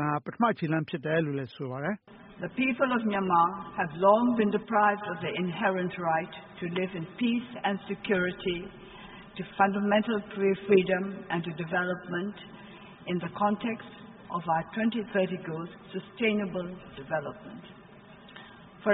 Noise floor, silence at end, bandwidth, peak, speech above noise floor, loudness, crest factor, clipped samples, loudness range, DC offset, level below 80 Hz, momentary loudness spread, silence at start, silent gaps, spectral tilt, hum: -51 dBFS; 0 s; 4 kHz; -10 dBFS; 22 dB; -29 LUFS; 20 dB; under 0.1%; 6 LU; under 0.1%; -64 dBFS; 20 LU; 0 s; none; -4.5 dB/octave; none